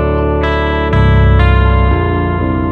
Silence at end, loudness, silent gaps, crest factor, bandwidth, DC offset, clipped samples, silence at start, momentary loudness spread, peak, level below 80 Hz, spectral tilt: 0 s; -12 LUFS; none; 10 dB; 4.5 kHz; under 0.1%; under 0.1%; 0 s; 5 LU; 0 dBFS; -14 dBFS; -9 dB/octave